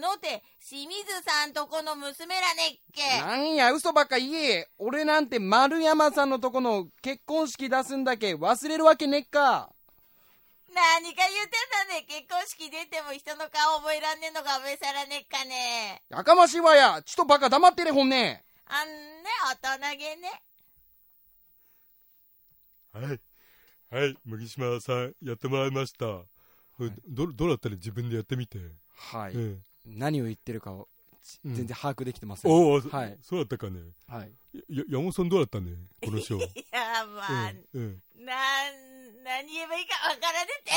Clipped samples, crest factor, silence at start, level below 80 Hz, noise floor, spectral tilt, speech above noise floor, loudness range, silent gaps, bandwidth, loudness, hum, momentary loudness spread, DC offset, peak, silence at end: under 0.1%; 24 dB; 0 s; -62 dBFS; -62 dBFS; -4 dB/octave; 35 dB; 13 LU; none; 16.5 kHz; -26 LUFS; none; 17 LU; under 0.1%; -4 dBFS; 0 s